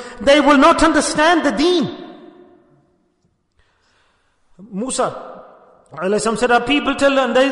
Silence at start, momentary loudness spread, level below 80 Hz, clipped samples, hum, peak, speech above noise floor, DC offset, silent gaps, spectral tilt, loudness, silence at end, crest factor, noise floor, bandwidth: 0 s; 16 LU; -42 dBFS; under 0.1%; none; -2 dBFS; 49 dB; under 0.1%; none; -3.5 dB/octave; -15 LUFS; 0 s; 16 dB; -64 dBFS; 11 kHz